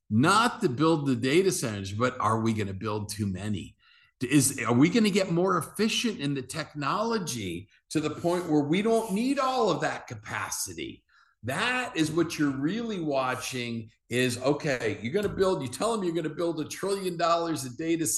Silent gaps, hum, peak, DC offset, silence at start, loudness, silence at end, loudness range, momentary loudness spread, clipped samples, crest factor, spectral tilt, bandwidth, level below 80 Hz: none; none; -10 dBFS; under 0.1%; 0.1 s; -27 LUFS; 0 s; 3 LU; 10 LU; under 0.1%; 18 dB; -4.5 dB/octave; 12.5 kHz; -60 dBFS